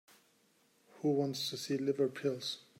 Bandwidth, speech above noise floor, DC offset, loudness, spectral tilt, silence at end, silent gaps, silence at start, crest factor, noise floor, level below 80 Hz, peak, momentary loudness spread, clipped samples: 16 kHz; 36 dB; under 0.1%; -35 LUFS; -5 dB/octave; 0.2 s; none; 0.95 s; 18 dB; -71 dBFS; -84 dBFS; -20 dBFS; 5 LU; under 0.1%